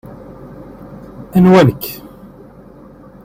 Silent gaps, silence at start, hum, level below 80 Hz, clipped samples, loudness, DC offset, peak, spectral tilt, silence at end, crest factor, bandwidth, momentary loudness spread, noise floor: none; 0.9 s; none; -44 dBFS; under 0.1%; -12 LUFS; under 0.1%; 0 dBFS; -7.5 dB/octave; 1.3 s; 16 dB; 16.5 kHz; 26 LU; -39 dBFS